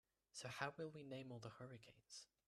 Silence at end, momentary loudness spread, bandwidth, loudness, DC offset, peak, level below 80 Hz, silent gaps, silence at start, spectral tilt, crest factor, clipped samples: 0.25 s; 11 LU; 13 kHz; -54 LUFS; under 0.1%; -28 dBFS; -86 dBFS; none; 0.35 s; -4 dB/octave; 26 dB; under 0.1%